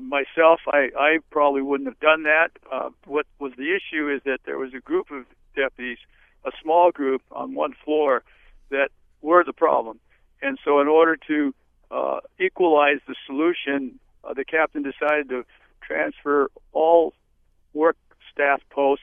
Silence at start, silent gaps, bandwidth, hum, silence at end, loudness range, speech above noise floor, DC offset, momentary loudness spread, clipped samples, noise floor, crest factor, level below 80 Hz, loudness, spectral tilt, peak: 0 s; none; 3.7 kHz; none; 0.05 s; 4 LU; 40 dB; under 0.1%; 15 LU; under 0.1%; -62 dBFS; 20 dB; -60 dBFS; -22 LUFS; -7 dB/octave; -2 dBFS